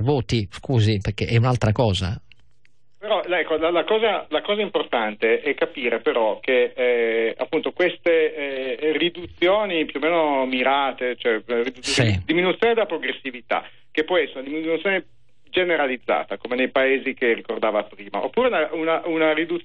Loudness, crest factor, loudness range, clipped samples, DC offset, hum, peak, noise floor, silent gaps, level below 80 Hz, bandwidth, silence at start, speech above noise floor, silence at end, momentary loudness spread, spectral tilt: -22 LUFS; 14 dB; 2 LU; under 0.1%; 0.5%; none; -8 dBFS; -65 dBFS; none; -50 dBFS; 9.6 kHz; 0 s; 44 dB; 0.05 s; 6 LU; -6 dB/octave